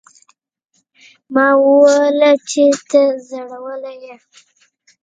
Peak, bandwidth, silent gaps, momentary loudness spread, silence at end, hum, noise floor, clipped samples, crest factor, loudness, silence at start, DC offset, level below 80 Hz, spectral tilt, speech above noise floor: 0 dBFS; 9.2 kHz; none; 18 LU; 0.9 s; none; -55 dBFS; under 0.1%; 16 dB; -12 LUFS; 1.3 s; under 0.1%; -72 dBFS; -2.5 dB/octave; 41 dB